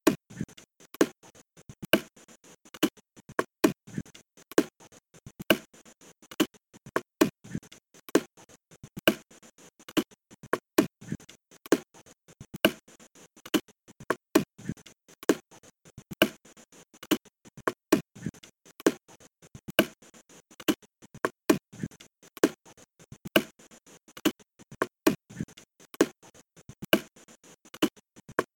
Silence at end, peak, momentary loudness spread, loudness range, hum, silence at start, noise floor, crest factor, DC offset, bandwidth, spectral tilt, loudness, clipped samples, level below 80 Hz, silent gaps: 0.1 s; -2 dBFS; 20 LU; 2 LU; none; 0.05 s; -56 dBFS; 30 dB; under 0.1%; 17.5 kHz; -4 dB/octave; -30 LUFS; under 0.1%; -64 dBFS; none